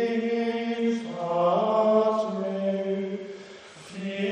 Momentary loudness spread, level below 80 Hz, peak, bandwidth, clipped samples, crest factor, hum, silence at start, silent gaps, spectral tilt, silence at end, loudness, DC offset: 19 LU; -74 dBFS; -10 dBFS; 9.6 kHz; under 0.1%; 16 dB; none; 0 s; none; -6.5 dB/octave; 0 s; -26 LUFS; under 0.1%